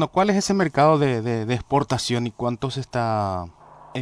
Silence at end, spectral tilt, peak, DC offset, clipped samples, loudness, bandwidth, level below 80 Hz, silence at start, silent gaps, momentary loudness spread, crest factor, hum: 0 s; -5.5 dB/octave; -4 dBFS; under 0.1%; under 0.1%; -22 LUFS; 11 kHz; -50 dBFS; 0 s; none; 10 LU; 18 dB; none